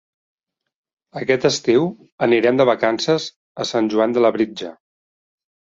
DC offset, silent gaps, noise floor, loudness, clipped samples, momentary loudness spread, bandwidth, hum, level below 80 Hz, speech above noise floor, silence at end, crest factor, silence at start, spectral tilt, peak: under 0.1%; 2.12-2.18 s, 3.36-3.55 s; under -90 dBFS; -18 LUFS; under 0.1%; 12 LU; 7.8 kHz; none; -64 dBFS; over 72 dB; 1.05 s; 18 dB; 1.15 s; -5 dB/octave; -2 dBFS